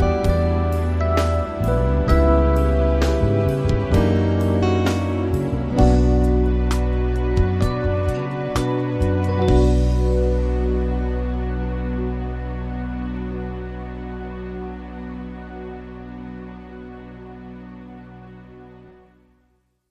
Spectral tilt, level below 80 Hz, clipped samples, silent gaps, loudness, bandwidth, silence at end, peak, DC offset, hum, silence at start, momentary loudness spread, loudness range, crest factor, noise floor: -8 dB/octave; -24 dBFS; under 0.1%; none; -21 LUFS; 11.5 kHz; 1 s; -4 dBFS; under 0.1%; none; 0 s; 20 LU; 17 LU; 16 dB; -65 dBFS